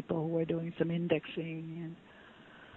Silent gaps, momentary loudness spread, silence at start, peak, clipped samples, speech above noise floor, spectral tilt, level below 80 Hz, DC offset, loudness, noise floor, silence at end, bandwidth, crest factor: none; 22 LU; 0 s; -16 dBFS; under 0.1%; 20 dB; -9.5 dB/octave; -68 dBFS; under 0.1%; -35 LUFS; -56 dBFS; 0 s; 4.1 kHz; 20 dB